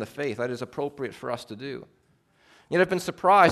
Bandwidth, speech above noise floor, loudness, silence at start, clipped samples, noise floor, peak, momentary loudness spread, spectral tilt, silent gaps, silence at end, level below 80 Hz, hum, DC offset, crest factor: 13.5 kHz; 36 dB; -27 LUFS; 0 s; under 0.1%; -61 dBFS; -6 dBFS; 15 LU; -5.5 dB/octave; none; 0 s; -66 dBFS; none; under 0.1%; 20 dB